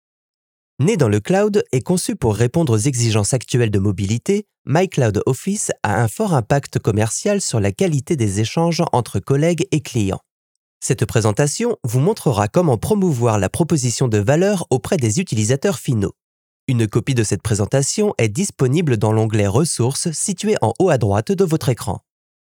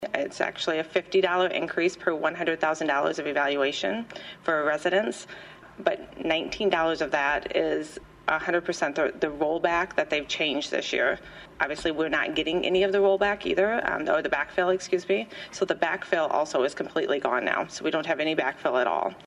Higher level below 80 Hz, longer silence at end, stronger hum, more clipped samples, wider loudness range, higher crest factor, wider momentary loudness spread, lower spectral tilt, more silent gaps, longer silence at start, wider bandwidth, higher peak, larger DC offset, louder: first, -50 dBFS vs -58 dBFS; first, 0.5 s vs 0 s; neither; neither; about the same, 2 LU vs 2 LU; about the same, 18 dB vs 20 dB; about the same, 4 LU vs 6 LU; first, -5.5 dB/octave vs -4 dB/octave; first, 4.58-4.65 s, 10.31-10.80 s, 16.23-16.67 s vs none; first, 0.8 s vs 0 s; first, 17 kHz vs 11.5 kHz; first, 0 dBFS vs -8 dBFS; neither; first, -18 LUFS vs -26 LUFS